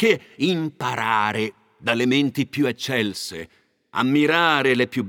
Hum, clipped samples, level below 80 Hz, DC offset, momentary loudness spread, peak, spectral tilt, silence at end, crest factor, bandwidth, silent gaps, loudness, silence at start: none; under 0.1%; -66 dBFS; under 0.1%; 12 LU; -2 dBFS; -5 dB/octave; 0 s; 20 dB; 17.5 kHz; none; -21 LUFS; 0 s